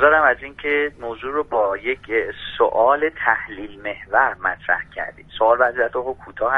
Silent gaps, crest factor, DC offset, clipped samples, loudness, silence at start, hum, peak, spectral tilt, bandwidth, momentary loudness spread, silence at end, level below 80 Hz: none; 20 dB; under 0.1%; under 0.1%; -20 LUFS; 0 s; none; -2 dBFS; -6 dB/octave; 4.1 kHz; 14 LU; 0 s; -50 dBFS